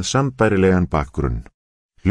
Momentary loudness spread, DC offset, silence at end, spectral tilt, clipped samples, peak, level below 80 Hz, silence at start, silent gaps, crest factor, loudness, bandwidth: 9 LU; under 0.1%; 0 s; -6 dB/octave; under 0.1%; -2 dBFS; -32 dBFS; 0 s; 1.54-1.89 s; 16 dB; -19 LUFS; 10.5 kHz